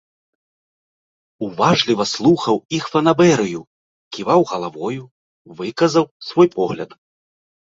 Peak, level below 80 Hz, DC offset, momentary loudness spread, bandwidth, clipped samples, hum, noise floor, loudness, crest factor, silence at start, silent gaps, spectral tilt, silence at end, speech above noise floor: -2 dBFS; -58 dBFS; under 0.1%; 15 LU; 7.8 kHz; under 0.1%; none; under -90 dBFS; -17 LUFS; 18 dB; 1.4 s; 2.65-2.69 s, 3.67-4.11 s, 5.11-5.45 s, 6.11-6.20 s; -5.5 dB/octave; 0.9 s; over 73 dB